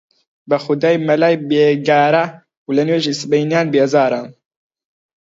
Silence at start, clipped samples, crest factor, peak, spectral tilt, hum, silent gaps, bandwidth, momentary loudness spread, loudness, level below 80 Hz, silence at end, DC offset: 0.5 s; under 0.1%; 16 dB; 0 dBFS; -6 dB/octave; none; 2.57-2.66 s; 7.8 kHz; 7 LU; -15 LUFS; -68 dBFS; 1 s; under 0.1%